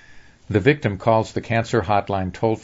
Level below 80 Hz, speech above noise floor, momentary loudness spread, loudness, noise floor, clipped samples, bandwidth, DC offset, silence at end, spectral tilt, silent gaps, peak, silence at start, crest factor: -48 dBFS; 25 dB; 5 LU; -21 LUFS; -45 dBFS; under 0.1%; 7.8 kHz; under 0.1%; 0.05 s; -7 dB/octave; none; -2 dBFS; 0.1 s; 18 dB